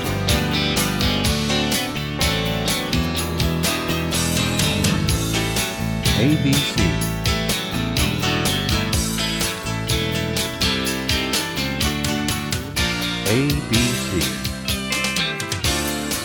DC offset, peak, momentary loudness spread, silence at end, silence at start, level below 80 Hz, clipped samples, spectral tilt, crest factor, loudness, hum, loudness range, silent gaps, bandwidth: under 0.1%; -4 dBFS; 4 LU; 0 s; 0 s; -32 dBFS; under 0.1%; -4 dB/octave; 16 dB; -20 LUFS; none; 2 LU; none; 19.5 kHz